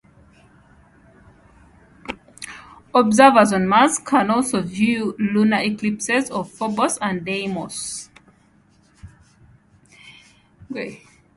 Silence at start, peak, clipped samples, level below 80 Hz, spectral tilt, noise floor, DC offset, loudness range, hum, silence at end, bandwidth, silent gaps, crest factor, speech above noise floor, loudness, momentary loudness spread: 2.1 s; 0 dBFS; under 0.1%; -56 dBFS; -4.5 dB/octave; -56 dBFS; under 0.1%; 17 LU; none; 0.4 s; 11.5 kHz; none; 20 dB; 38 dB; -19 LUFS; 21 LU